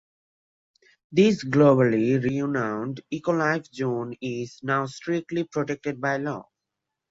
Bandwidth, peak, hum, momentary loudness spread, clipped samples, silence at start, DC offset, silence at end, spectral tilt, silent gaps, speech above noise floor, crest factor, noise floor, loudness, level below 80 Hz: 7.8 kHz; -6 dBFS; none; 12 LU; under 0.1%; 1.1 s; under 0.1%; 0.7 s; -7 dB/octave; none; 60 dB; 18 dB; -84 dBFS; -25 LUFS; -64 dBFS